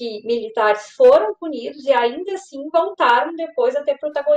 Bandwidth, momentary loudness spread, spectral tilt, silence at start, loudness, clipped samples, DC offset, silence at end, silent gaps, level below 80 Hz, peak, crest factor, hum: 9 kHz; 14 LU; -3 dB/octave; 0 s; -18 LUFS; under 0.1%; under 0.1%; 0 s; none; -66 dBFS; -4 dBFS; 14 dB; none